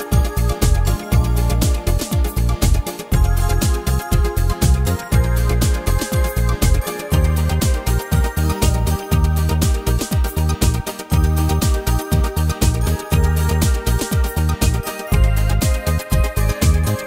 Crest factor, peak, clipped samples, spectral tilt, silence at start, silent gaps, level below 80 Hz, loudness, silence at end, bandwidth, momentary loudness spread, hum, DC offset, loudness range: 16 dB; 0 dBFS; under 0.1%; -5.5 dB/octave; 0 s; none; -20 dBFS; -18 LUFS; 0 s; 16.5 kHz; 3 LU; none; under 0.1%; 0 LU